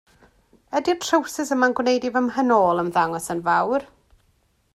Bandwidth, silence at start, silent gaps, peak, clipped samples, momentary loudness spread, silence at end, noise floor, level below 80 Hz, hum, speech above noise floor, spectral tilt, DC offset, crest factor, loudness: 15 kHz; 0.7 s; none; -4 dBFS; under 0.1%; 7 LU; 0.9 s; -64 dBFS; -60 dBFS; none; 43 dB; -4 dB/octave; under 0.1%; 18 dB; -21 LUFS